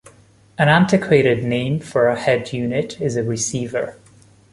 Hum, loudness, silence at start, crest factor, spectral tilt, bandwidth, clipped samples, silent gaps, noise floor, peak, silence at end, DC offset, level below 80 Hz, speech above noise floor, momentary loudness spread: none; -18 LUFS; 0.6 s; 18 dB; -5.5 dB/octave; 11.5 kHz; under 0.1%; none; -49 dBFS; -2 dBFS; 0.6 s; under 0.1%; -52 dBFS; 32 dB; 9 LU